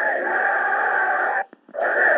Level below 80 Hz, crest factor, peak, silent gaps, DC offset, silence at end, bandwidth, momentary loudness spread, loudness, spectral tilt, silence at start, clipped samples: -76 dBFS; 14 dB; -6 dBFS; none; under 0.1%; 0 s; 4.5 kHz; 7 LU; -21 LUFS; -6 dB/octave; 0 s; under 0.1%